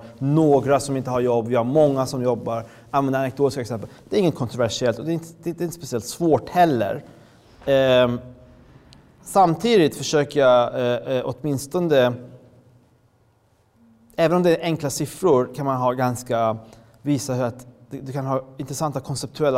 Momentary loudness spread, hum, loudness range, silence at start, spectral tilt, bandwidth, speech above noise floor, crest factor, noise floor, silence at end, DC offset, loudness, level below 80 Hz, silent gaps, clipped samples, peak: 12 LU; none; 5 LU; 0 s; -6 dB/octave; 16 kHz; 40 dB; 14 dB; -61 dBFS; 0 s; under 0.1%; -21 LUFS; -56 dBFS; none; under 0.1%; -6 dBFS